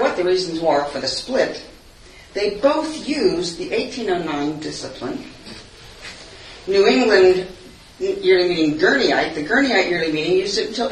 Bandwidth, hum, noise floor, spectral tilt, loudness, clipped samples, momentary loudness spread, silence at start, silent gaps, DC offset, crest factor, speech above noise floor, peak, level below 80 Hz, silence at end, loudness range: 10.5 kHz; none; -44 dBFS; -4 dB/octave; -19 LUFS; under 0.1%; 19 LU; 0 s; none; under 0.1%; 18 dB; 25 dB; 0 dBFS; -50 dBFS; 0 s; 7 LU